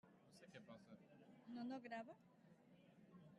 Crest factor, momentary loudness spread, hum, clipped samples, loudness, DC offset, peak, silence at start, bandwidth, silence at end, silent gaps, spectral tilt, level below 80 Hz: 18 dB; 16 LU; none; under 0.1%; -57 LUFS; under 0.1%; -42 dBFS; 0.05 s; 11.5 kHz; 0 s; none; -6 dB/octave; under -90 dBFS